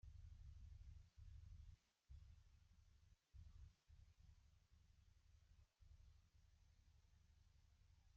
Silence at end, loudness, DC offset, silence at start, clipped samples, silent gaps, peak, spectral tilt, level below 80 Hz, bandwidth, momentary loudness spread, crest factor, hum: 0 s; -66 LUFS; under 0.1%; 0.05 s; under 0.1%; none; -52 dBFS; -6.5 dB/octave; -68 dBFS; 7 kHz; 5 LU; 14 dB; none